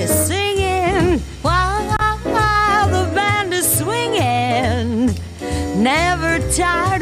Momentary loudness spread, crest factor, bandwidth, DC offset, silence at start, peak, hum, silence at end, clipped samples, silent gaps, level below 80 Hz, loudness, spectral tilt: 4 LU; 14 dB; 15.5 kHz; under 0.1%; 0 s; -2 dBFS; none; 0 s; under 0.1%; none; -30 dBFS; -17 LUFS; -4 dB/octave